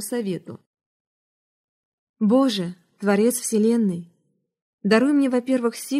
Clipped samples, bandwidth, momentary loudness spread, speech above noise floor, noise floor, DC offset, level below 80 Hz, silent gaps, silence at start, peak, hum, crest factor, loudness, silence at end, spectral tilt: under 0.1%; 15.5 kHz; 11 LU; 49 dB; -70 dBFS; under 0.1%; -74 dBFS; 0.66-0.74 s, 0.86-2.14 s, 4.62-4.78 s; 0 s; -6 dBFS; none; 18 dB; -21 LUFS; 0 s; -5 dB/octave